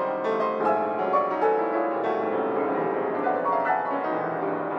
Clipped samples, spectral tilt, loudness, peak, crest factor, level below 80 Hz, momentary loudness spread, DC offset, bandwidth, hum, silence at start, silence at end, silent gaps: under 0.1%; -7.5 dB/octave; -25 LUFS; -10 dBFS; 14 dB; -76 dBFS; 3 LU; under 0.1%; 6.6 kHz; none; 0 s; 0 s; none